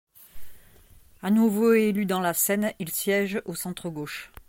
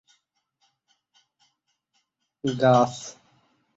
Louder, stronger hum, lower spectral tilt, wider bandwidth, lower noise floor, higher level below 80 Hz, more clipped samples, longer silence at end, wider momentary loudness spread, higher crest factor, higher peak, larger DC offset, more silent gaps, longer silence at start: second, -25 LUFS vs -22 LUFS; neither; second, -4.5 dB/octave vs -6 dB/octave; first, 17 kHz vs 8 kHz; second, -53 dBFS vs -74 dBFS; first, -58 dBFS vs -66 dBFS; neither; second, 0.2 s vs 0.65 s; second, 13 LU vs 19 LU; second, 16 dB vs 22 dB; about the same, -10 dBFS vs -8 dBFS; neither; neither; second, 0.2 s vs 2.45 s